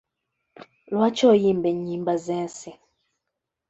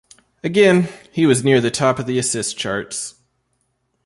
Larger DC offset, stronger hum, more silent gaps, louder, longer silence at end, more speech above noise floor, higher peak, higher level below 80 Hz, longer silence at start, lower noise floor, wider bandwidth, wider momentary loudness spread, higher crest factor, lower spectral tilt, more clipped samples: neither; neither; neither; second, -22 LUFS vs -18 LUFS; about the same, 0.95 s vs 0.95 s; first, 61 dB vs 51 dB; second, -6 dBFS vs -2 dBFS; second, -66 dBFS vs -56 dBFS; first, 0.9 s vs 0.45 s; first, -83 dBFS vs -69 dBFS; second, 8.2 kHz vs 11.5 kHz; first, 16 LU vs 13 LU; about the same, 18 dB vs 18 dB; first, -6 dB/octave vs -4.5 dB/octave; neither